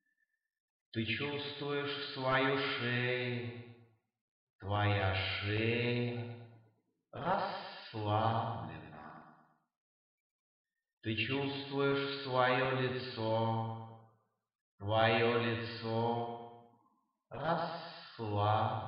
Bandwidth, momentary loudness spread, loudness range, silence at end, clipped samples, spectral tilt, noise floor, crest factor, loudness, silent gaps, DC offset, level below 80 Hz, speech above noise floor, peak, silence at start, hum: 5.6 kHz; 16 LU; 5 LU; 0 s; under 0.1%; -9 dB/octave; -82 dBFS; 20 dB; -35 LUFS; 4.21-4.59 s, 9.77-10.65 s, 10.93-11.01 s, 14.55-14.78 s; under 0.1%; -72 dBFS; 48 dB; -16 dBFS; 0.95 s; none